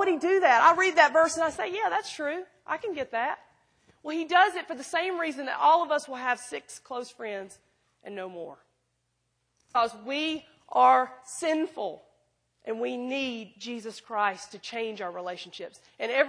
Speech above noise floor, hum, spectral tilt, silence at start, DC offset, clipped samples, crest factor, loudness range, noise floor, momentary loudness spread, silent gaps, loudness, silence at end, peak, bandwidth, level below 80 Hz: 49 dB; none; -2.5 dB/octave; 0 s; under 0.1%; under 0.1%; 24 dB; 9 LU; -77 dBFS; 19 LU; none; -27 LUFS; 0 s; -4 dBFS; 10.5 kHz; -74 dBFS